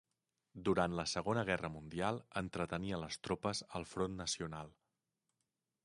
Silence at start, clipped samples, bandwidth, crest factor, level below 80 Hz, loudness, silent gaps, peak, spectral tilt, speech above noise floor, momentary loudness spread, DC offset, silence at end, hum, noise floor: 0.55 s; under 0.1%; 11.5 kHz; 22 dB; -62 dBFS; -40 LUFS; none; -18 dBFS; -4.5 dB/octave; 49 dB; 9 LU; under 0.1%; 1.15 s; none; -88 dBFS